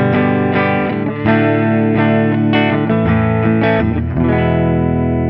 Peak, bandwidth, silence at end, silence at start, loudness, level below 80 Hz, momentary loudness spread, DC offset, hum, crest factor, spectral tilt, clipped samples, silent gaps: 0 dBFS; 5.4 kHz; 0 s; 0 s; -14 LUFS; -32 dBFS; 3 LU; under 0.1%; none; 12 dB; -11 dB/octave; under 0.1%; none